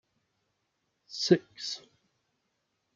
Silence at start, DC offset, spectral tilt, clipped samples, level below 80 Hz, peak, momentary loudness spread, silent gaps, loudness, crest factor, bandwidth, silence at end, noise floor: 1.1 s; under 0.1%; -5 dB/octave; under 0.1%; -82 dBFS; -8 dBFS; 15 LU; none; -29 LUFS; 26 dB; 7.6 kHz; 1.2 s; -79 dBFS